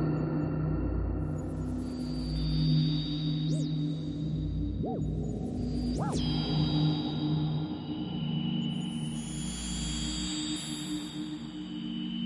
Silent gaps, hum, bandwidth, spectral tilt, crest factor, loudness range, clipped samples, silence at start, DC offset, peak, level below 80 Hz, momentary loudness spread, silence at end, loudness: none; none; 11.5 kHz; -6 dB/octave; 14 dB; 3 LU; under 0.1%; 0 s; under 0.1%; -18 dBFS; -42 dBFS; 7 LU; 0 s; -32 LUFS